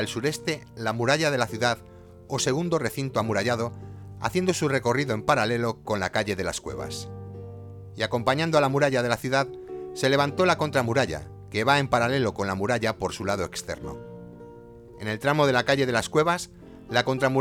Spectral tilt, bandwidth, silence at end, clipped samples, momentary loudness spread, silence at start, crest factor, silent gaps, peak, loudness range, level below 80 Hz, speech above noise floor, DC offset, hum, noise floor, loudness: -4.5 dB/octave; 19 kHz; 0 s; under 0.1%; 16 LU; 0 s; 20 dB; none; -6 dBFS; 4 LU; -54 dBFS; 21 dB; under 0.1%; none; -46 dBFS; -25 LUFS